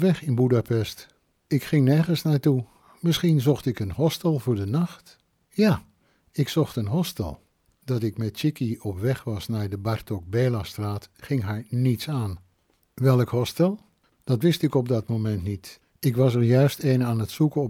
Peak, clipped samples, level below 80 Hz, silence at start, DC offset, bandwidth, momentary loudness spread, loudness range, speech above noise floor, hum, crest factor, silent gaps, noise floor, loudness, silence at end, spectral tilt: -8 dBFS; under 0.1%; -54 dBFS; 0 s; under 0.1%; 17 kHz; 11 LU; 5 LU; 44 dB; none; 16 dB; none; -67 dBFS; -25 LUFS; 0 s; -7 dB/octave